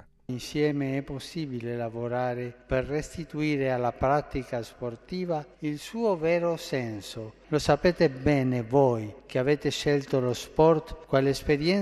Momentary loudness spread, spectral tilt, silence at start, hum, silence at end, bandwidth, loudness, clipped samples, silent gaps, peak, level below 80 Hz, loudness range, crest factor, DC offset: 12 LU; -6 dB/octave; 0.3 s; none; 0 s; 13 kHz; -28 LUFS; under 0.1%; none; -8 dBFS; -48 dBFS; 5 LU; 20 dB; under 0.1%